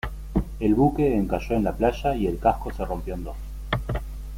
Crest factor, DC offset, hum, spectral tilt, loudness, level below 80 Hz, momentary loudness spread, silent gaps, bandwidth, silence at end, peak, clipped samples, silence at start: 18 dB; under 0.1%; none; -8 dB/octave; -25 LUFS; -34 dBFS; 12 LU; none; 16.5 kHz; 0 s; -8 dBFS; under 0.1%; 0.05 s